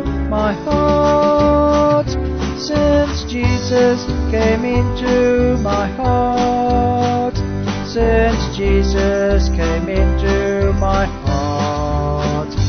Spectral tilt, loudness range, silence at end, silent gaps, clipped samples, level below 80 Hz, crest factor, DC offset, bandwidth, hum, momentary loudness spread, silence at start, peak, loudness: -6.5 dB/octave; 2 LU; 0 s; none; under 0.1%; -22 dBFS; 14 dB; under 0.1%; 6.6 kHz; none; 6 LU; 0 s; -2 dBFS; -16 LUFS